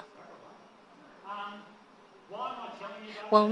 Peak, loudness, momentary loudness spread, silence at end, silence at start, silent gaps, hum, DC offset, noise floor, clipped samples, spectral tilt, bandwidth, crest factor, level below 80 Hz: -6 dBFS; -34 LUFS; 23 LU; 0 s; 0 s; none; none; under 0.1%; -57 dBFS; under 0.1%; -6.5 dB/octave; 10.5 kHz; 28 dB; -86 dBFS